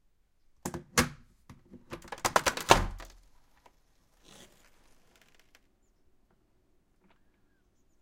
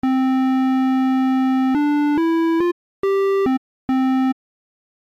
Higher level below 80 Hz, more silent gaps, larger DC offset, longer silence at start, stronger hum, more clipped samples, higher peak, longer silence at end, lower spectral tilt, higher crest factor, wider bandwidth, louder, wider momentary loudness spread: first, -48 dBFS vs -58 dBFS; second, none vs 2.72-3.03 s, 3.58-3.88 s; neither; first, 0.65 s vs 0.05 s; neither; neither; first, -2 dBFS vs -14 dBFS; first, 4.95 s vs 0.85 s; second, -3 dB/octave vs -6 dB/octave; first, 34 dB vs 6 dB; first, 16.5 kHz vs 7 kHz; second, -29 LUFS vs -19 LUFS; first, 23 LU vs 6 LU